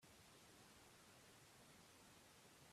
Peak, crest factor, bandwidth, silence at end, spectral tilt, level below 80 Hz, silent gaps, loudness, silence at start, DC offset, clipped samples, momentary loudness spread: -54 dBFS; 14 dB; 15 kHz; 0 s; -2.5 dB/octave; -86 dBFS; none; -66 LUFS; 0 s; under 0.1%; under 0.1%; 1 LU